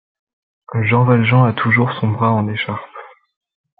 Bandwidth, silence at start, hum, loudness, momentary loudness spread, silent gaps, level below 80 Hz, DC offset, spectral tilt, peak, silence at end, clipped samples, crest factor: 4.2 kHz; 0.7 s; none; -16 LUFS; 12 LU; none; -58 dBFS; under 0.1%; -12 dB/octave; -2 dBFS; 0.75 s; under 0.1%; 16 dB